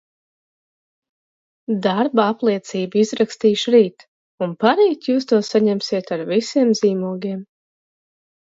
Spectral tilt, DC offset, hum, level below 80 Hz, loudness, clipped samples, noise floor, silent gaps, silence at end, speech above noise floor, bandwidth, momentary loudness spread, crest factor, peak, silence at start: -5.5 dB/octave; under 0.1%; none; -70 dBFS; -19 LUFS; under 0.1%; under -90 dBFS; 4.08-4.38 s; 1.15 s; over 72 dB; 7.8 kHz; 10 LU; 18 dB; -2 dBFS; 1.7 s